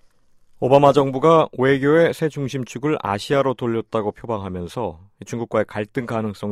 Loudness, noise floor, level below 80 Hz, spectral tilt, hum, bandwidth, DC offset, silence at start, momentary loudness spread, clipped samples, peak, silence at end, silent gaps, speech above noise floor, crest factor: -20 LUFS; -53 dBFS; -54 dBFS; -6.5 dB/octave; none; 13.5 kHz; under 0.1%; 0.6 s; 13 LU; under 0.1%; 0 dBFS; 0 s; none; 34 dB; 20 dB